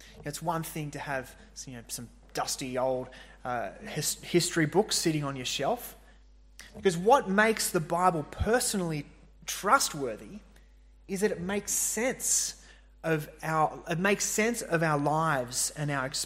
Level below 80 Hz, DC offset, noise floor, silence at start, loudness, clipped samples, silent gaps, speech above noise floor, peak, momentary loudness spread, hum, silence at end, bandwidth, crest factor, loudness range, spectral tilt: -52 dBFS; under 0.1%; -56 dBFS; 0 s; -29 LUFS; under 0.1%; none; 26 dB; -8 dBFS; 14 LU; none; 0 s; 16 kHz; 22 dB; 6 LU; -3.5 dB/octave